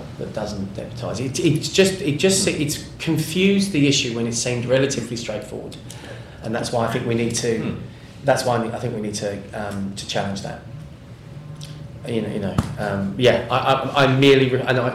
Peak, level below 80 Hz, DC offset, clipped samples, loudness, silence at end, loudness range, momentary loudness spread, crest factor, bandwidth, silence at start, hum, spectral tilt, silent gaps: -4 dBFS; -48 dBFS; under 0.1%; under 0.1%; -21 LUFS; 0 s; 9 LU; 18 LU; 16 dB; 15.5 kHz; 0 s; none; -4.5 dB/octave; none